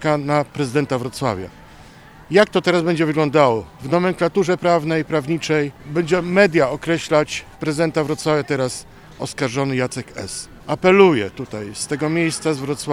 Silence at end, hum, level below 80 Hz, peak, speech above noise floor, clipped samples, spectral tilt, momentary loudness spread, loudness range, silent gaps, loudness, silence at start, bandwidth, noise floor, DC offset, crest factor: 0 s; none; -50 dBFS; 0 dBFS; 24 dB; under 0.1%; -5.5 dB/octave; 12 LU; 3 LU; none; -19 LUFS; 0 s; 14.5 kHz; -43 dBFS; under 0.1%; 18 dB